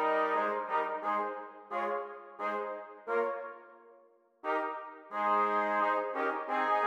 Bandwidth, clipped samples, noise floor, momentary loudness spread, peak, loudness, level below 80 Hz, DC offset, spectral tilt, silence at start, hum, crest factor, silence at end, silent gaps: 14.5 kHz; under 0.1%; -63 dBFS; 13 LU; -18 dBFS; -33 LUFS; under -90 dBFS; under 0.1%; -5 dB/octave; 0 s; none; 16 dB; 0 s; none